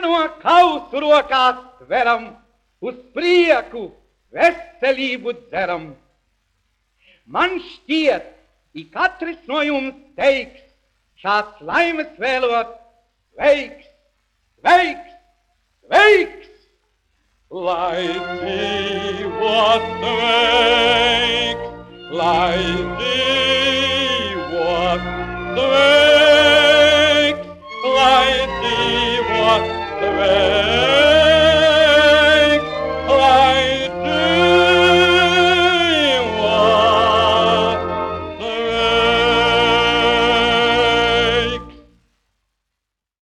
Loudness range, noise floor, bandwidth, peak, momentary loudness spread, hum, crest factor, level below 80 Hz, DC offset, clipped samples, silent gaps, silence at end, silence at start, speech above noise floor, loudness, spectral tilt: 9 LU; -80 dBFS; 12.5 kHz; -2 dBFS; 14 LU; none; 14 dB; -42 dBFS; under 0.1%; under 0.1%; none; 1.5 s; 0 s; 63 dB; -15 LUFS; -4 dB/octave